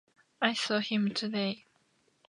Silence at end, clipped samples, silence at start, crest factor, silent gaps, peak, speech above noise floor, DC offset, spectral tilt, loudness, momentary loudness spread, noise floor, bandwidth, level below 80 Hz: 0.7 s; under 0.1%; 0.4 s; 24 dB; none; -10 dBFS; 40 dB; under 0.1%; -4.5 dB/octave; -31 LUFS; 6 LU; -71 dBFS; 11 kHz; -82 dBFS